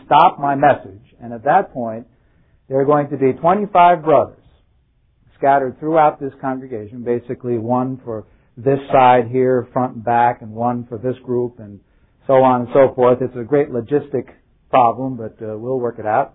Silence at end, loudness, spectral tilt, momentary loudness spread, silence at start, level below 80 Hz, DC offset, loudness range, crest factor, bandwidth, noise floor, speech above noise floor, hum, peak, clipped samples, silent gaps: 0.05 s; -17 LUFS; -11 dB/octave; 14 LU; 0.1 s; -54 dBFS; under 0.1%; 3 LU; 18 dB; 4 kHz; -58 dBFS; 42 dB; none; 0 dBFS; under 0.1%; none